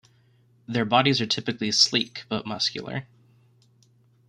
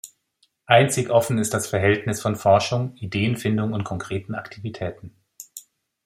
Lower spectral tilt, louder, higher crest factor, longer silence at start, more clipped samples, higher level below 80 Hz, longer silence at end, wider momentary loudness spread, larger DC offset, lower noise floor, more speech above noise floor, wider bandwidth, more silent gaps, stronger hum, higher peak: second, -3.5 dB/octave vs -5 dB/octave; about the same, -23 LUFS vs -22 LUFS; about the same, 24 dB vs 22 dB; first, 0.7 s vs 0.05 s; neither; second, -66 dBFS vs -58 dBFS; first, 1.25 s vs 0.45 s; second, 13 LU vs 17 LU; neither; second, -60 dBFS vs -67 dBFS; second, 36 dB vs 45 dB; about the same, 15 kHz vs 16 kHz; neither; neither; about the same, -4 dBFS vs -2 dBFS